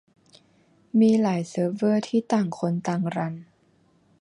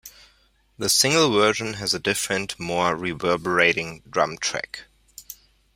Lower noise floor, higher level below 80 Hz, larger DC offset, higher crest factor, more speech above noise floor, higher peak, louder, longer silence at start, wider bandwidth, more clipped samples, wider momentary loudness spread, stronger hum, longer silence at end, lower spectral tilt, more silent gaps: about the same, -62 dBFS vs -61 dBFS; second, -70 dBFS vs -56 dBFS; neither; second, 16 dB vs 22 dB; about the same, 39 dB vs 39 dB; second, -10 dBFS vs -2 dBFS; about the same, -24 LUFS vs -22 LUFS; first, 0.95 s vs 0.05 s; second, 10.5 kHz vs 16 kHz; neither; second, 9 LU vs 20 LU; neither; first, 0.8 s vs 0.4 s; first, -7.5 dB/octave vs -2.5 dB/octave; neither